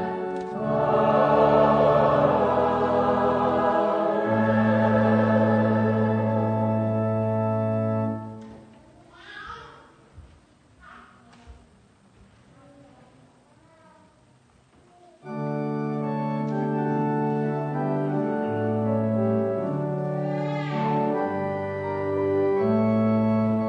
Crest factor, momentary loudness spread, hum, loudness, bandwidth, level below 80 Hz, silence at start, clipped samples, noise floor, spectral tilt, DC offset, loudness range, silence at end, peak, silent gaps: 18 dB; 10 LU; none; -23 LUFS; 6.4 kHz; -54 dBFS; 0 s; under 0.1%; -58 dBFS; -9.5 dB/octave; under 0.1%; 12 LU; 0 s; -8 dBFS; none